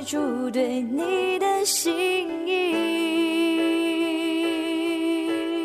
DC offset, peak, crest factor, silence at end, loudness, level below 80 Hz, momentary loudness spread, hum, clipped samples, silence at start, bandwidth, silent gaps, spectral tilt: under 0.1%; -12 dBFS; 12 dB; 0 s; -24 LUFS; -68 dBFS; 4 LU; none; under 0.1%; 0 s; 14 kHz; none; -2 dB/octave